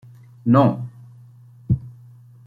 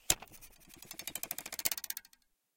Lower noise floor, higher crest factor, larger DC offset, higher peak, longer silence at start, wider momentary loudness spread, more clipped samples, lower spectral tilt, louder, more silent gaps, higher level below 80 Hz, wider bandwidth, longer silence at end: second, -46 dBFS vs -71 dBFS; second, 20 dB vs 34 dB; neither; first, -2 dBFS vs -8 dBFS; first, 0.45 s vs 0.1 s; about the same, 19 LU vs 21 LU; neither; first, -10.5 dB/octave vs 0 dB/octave; first, -20 LUFS vs -37 LUFS; neither; first, -48 dBFS vs -62 dBFS; second, 4.7 kHz vs 17 kHz; about the same, 0.55 s vs 0.55 s